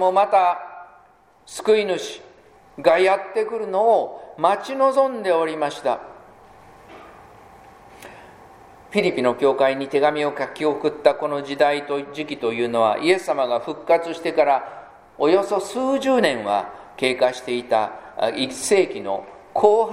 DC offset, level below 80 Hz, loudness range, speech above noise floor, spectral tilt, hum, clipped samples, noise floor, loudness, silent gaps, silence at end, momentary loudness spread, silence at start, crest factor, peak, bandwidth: under 0.1%; -62 dBFS; 5 LU; 34 dB; -4 dB/octave; none; under 0.1%; -54 dBFS; -21 LUFS; none; 0 s; 11 LU; 0 s; 20 dB; 0 dBFS; 14 kHz